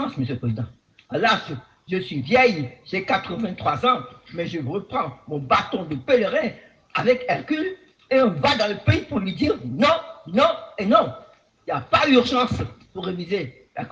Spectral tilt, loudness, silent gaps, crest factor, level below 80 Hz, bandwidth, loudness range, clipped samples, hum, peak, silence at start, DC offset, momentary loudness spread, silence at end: -6 dB/octave; -22 LUFS; none; 20 dB; -54 dBFS; 8 kHz; 3 LU; under 0.1%; none; -2 dBFS; 0 s; under 0.1%; 13 LU; 0 s